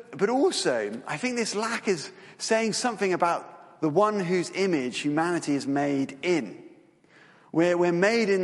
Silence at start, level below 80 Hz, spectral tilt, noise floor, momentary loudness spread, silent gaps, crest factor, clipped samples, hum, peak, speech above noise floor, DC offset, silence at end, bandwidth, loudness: 0.1 s; -74 dBFS; -4.5 dB/octave; -56 dBFS; 8 LU; none; 18 dB; under 0.1%; none; -8 dBFS; 31 dB; under 0.1%; 0 s; 11.5 kHz; -26 LUFS